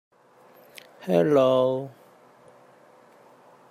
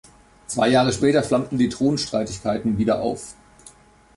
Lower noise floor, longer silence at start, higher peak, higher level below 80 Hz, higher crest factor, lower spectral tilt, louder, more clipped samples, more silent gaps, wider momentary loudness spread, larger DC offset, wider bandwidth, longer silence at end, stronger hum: first, -55 dBFS vs -49 dBFS; first, 1 s vs 0.5 s; about the same, -8 dBFS vs -6 dBFS; second, -76 dBFS vs -48 dBFS; about the same, 20 dB vs 16 dB; first, -7 dB/octave vs -5 dB/octave; about the same, -22 LUFS vs -21 LUFS; neither; neither; first, 19 LU vs 10 LU; neither; first, 15 kHz vs 11.5 kHz; first, 1.8 s vs 0.5 s; neither